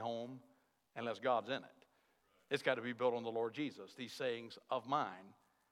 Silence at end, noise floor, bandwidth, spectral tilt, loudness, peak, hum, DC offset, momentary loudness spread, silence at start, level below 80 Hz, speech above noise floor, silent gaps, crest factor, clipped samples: 0.4 s; -76 dBFS; 15.5 kHz; -5 dB/octave; -41 LUFS; -20 dBFS; none; under 0.1%; 13 LU; 0 s; under -90 dBFS; 36 dB; none; 22 dB; under 0.1%